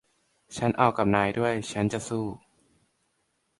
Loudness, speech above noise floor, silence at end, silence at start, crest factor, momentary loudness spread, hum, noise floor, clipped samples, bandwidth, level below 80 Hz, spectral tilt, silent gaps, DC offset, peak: -27 LUFS; 48 dB; 1.2 s; 0.5 s; 22 dB; 13 LU; none; -74 dBFS; under 0.1%; 11.5 kHz; -56 dBFS; -6 dB/octave; none; under 0.1%; -6 dBFS